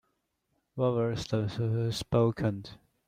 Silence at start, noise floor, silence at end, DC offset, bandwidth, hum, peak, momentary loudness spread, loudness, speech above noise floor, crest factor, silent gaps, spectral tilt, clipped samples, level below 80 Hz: 0.75 s; -78 dBFS; 0.35 s; under 0.1%; 14 kHz; none; -12 dBFS; 13 LU; -30 LUFS; 49 dB; 18 dB; none; -7 dB/octave; under 0.1%; -56 dBFS